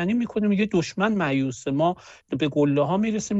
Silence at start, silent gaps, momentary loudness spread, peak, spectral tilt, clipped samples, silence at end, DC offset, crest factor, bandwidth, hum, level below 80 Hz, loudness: 0 s; none; 5 LU; -8 dBFS; -6 dB/octave; under 0.1%; 0 s; under 0.1%; 14 dB; 8.2 kHz; none; -58 dBFS; -24 LUFS